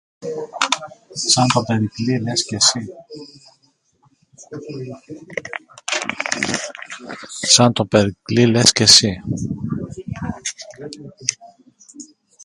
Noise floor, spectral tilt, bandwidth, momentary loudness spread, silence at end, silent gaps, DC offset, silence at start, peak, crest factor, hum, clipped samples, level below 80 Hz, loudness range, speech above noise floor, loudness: -61 dBFS; -3 dB/octave; 16 kHz; 22 LU; 0 s; none; under 0.1%; 0.2 s; 0 dBFS; 20 dB; none; under 0.1%; -48 dBFS; 13 LU; 42 dB; -17 LUFS